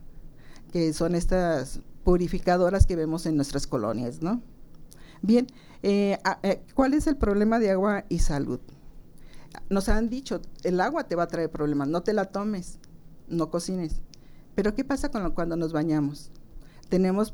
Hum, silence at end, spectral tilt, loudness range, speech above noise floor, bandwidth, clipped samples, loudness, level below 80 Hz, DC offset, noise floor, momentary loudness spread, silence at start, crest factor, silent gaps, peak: none; 0 s; -6.5 dB/octave; 5 LU; 20 dB; 17 kHz; under 0.1%; -27 LUFS; -34 dBFS; under 0.1%; -45 dBFS; 10 LU; 0 s; 22 dB; none; -4 dBFS